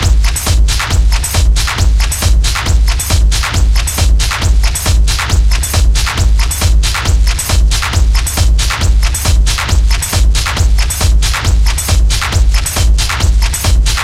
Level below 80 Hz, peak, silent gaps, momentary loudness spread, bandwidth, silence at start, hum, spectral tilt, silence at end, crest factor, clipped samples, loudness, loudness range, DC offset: -10 dBFS; 0 dBFS; none; 1 LU; 15.5 kHz; 0 s; none; -3 dB/octave; 0 s; 10 dB; under 0.1%; -12 LUFS; 0 LU; under 0.1%